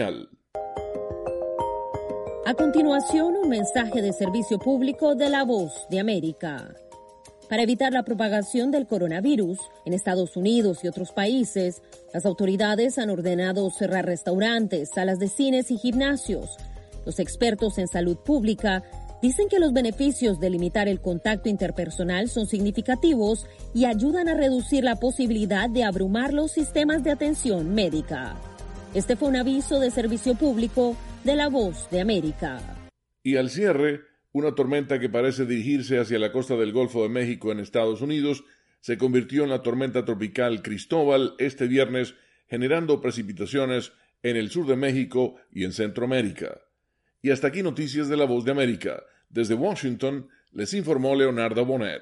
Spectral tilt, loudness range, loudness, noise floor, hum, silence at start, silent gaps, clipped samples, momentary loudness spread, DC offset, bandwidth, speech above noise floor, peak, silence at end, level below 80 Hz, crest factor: -5 dB/octave; 3 LU; -25 LUFS; -74 dBFS; none; 0 s; none; under 0.1%; 10 LU; under 0.1%; 11.5 kHz; 51 dB; -8 dBFS; 0 s; -44 dBFS; 16 dB